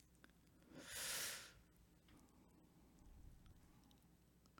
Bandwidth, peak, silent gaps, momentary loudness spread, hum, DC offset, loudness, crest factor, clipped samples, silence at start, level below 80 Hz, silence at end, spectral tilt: 18 kHz; -34 dBFS; none; 25 LU; none; under 0.1%; -48 LUFS; 24 dB; under 0.1%; 0 s; -72 dBFS; 0 s; -1 dB/octave